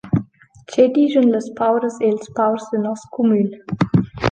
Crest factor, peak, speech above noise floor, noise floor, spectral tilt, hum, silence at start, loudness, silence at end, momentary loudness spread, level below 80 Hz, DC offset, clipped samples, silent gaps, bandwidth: 16 dB; -2 dBFS; 27 dB; -44 dBFS; -7.5 dB/octave; none; 0.05 s; -18 LUFS; 0 s; 8 LU; -48 dBFS; under 0.1%; under 0.1%; none; 9.2 kHz